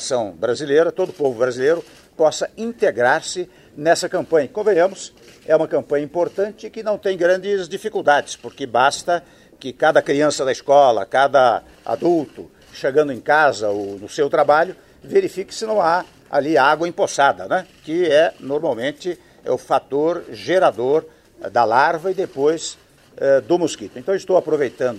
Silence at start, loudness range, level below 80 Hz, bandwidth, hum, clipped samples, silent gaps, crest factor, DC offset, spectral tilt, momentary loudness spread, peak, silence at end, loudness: 0 s; 3 LU; -60 dBFS; 13 kHz; none; under 0.1%; none; 18 dB; under 0.1%; -4 dB/octave; 11 LU; 0 dBFS; 0 s; -19 LUFS